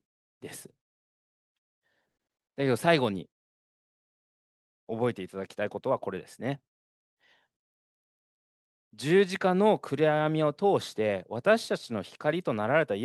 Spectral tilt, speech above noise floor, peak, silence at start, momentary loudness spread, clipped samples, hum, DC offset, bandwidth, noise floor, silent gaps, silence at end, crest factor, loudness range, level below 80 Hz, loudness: -6 dB/octave; over 62 dB; -8 dBFS; 0.45 s; 15 LU; under 0.1%; none; under 0.1%; 12.5 kHz; under -90 dBFS; 0.81-1.82 s, 3.32-4.87 s, 6.68-7.17 s, 7.56-8.91 s; 0 s; 24 dB; 10 LU; -76 dBFS; -28 LUFS